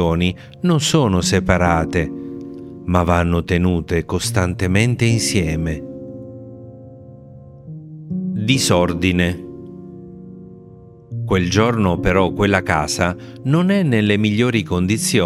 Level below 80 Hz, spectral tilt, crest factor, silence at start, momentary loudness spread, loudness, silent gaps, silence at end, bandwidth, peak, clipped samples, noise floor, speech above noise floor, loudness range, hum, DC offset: -40 dBFS; -5 dB/octave; 18 dB; 0 s; 20 LU; -18 LUFS; none; 0 s; 15.5 kHz; 0 dBFS; under 0.1%; -41 dBFS; 25 dB; 5 LU; none; under 0.1%